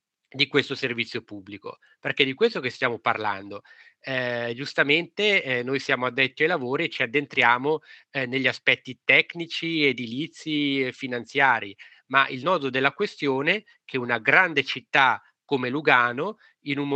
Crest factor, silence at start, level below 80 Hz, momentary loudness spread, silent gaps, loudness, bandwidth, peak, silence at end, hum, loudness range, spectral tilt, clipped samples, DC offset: 24 dB; 0.35 s; -78 dBFS; 13 LU; none; -23 LUFS; 8.6 kHz; -2 dBFS; 0 s; none; 4 LU; -5 dB/octave; under 0.1%; under 0.1%